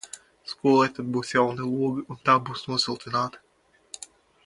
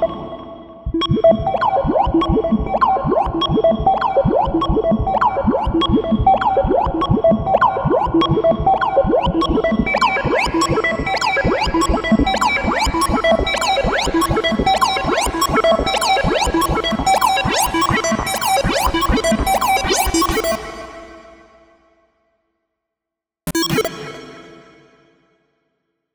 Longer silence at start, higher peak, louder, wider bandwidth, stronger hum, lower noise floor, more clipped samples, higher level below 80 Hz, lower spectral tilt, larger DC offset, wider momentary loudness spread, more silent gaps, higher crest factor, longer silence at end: about the same, 0.05 s vs 0 s; second, -6 dBFS vs 0 dBFS; second, -25 LUFS vs -16 LUFS; second, 11.5 kHz vs over 20 kHz; neither; second, -48 dBFS vs -85 dBFS; neither; second, -66 dBFS vs -30 dBFS; about the same, -5 dB/octave vs -4.5 dB/octave; neither; first, 19 LU vs 5 LU; neither; first, 22 dB vs 16 dB; second, 0.4 s vs 1.6 s